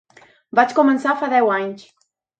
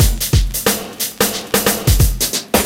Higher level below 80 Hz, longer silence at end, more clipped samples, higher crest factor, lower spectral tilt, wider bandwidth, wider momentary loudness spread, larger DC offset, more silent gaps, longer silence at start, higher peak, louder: second, -72 dBFS vs -20 dBFS; first, 0.6 s vs 0 s; neither; about the same, 18 dB vs 14 dB; first, -5.5 dB/octave vs -3.5 dB/octave; second, 8.8 kHz vs 17 kHz; first, 11 LU vs 4 LU; neither; neither; first, 0.55 s vs 0 s; about the same, -2 dBFS vs -2 dBFS; about the same, -17 LUFS vs -16 LUFS